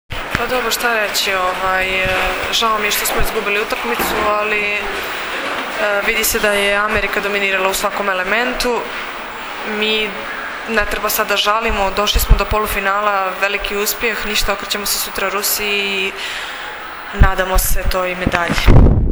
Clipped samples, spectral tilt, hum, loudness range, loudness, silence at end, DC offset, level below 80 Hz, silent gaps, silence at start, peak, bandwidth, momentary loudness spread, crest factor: under 0.1%; -3.5 dB/octave; none; 2 LU; -16 LUFS; 0 s; under 0.1%; -22 dBFS; none; 0.1 s; 0 dBFS; over 20 kHz; 7 LU; 16 dB